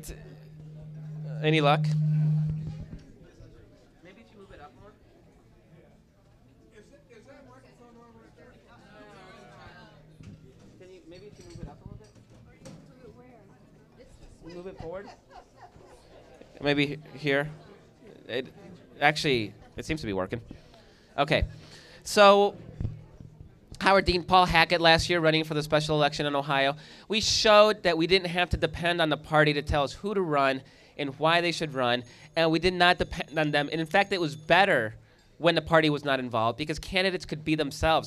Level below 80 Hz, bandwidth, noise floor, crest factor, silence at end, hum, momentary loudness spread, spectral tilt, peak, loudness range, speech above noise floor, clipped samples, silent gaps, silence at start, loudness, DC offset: -48 dBFS; 14 kHz; -59 dBFS; 24 dB; 0 s; none; 21 LU; -5 dB/octave; -4 dBFS; 11 LU; 34 dB; under 0.1%; none; 0 s; -25 LUFS; under 0.1%